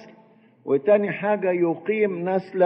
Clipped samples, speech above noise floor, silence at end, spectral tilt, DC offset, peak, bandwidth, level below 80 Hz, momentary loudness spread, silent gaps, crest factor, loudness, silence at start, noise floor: under 0.1%; 33 dB; 0 s; -10 dB/octave; under 0.1%; -6 dBFS; 5.6 kHz; -74 dBFS; 6 LU; none; 16 dB; -23 LUFS; 0 s; -54 dBFS